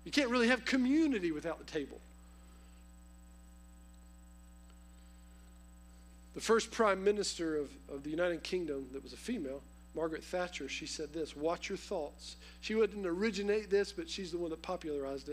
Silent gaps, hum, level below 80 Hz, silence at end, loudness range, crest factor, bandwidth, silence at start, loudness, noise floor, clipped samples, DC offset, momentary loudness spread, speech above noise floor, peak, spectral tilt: none; 60 Hz at -55 dBFS; -58 dBFS; 0 s; 6 LU; 24 dB; 15.5 kHz; 0 s; -36 LUFS; -56 dBFS; under 0.1%; under 0.1%; 15 LU; 21 dB; -12 dBFS; -4 dB/octave